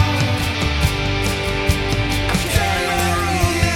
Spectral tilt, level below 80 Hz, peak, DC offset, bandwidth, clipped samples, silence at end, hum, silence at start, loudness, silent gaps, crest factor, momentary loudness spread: -4.5 dB/octave; -26 dBFS; -2 dBFS; under 0.1%; 19.5 kHz; under 0.1%; 0 s; none; 0 s; -18 LUFS; none; 16 dB; 2 LU